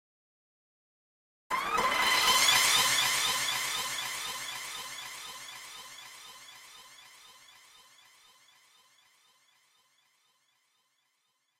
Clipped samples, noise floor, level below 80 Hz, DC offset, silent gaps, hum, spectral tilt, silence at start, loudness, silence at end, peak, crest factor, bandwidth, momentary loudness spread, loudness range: under 0.1%; -77 dBFS; -66 dBFS; under 0.1%; none; none; 1 dB/octave; 1.5 s; -27 LUFS; 4.55 s; -12 dBFS; 22 dB; 16 kHz; 25 LU; 21 LU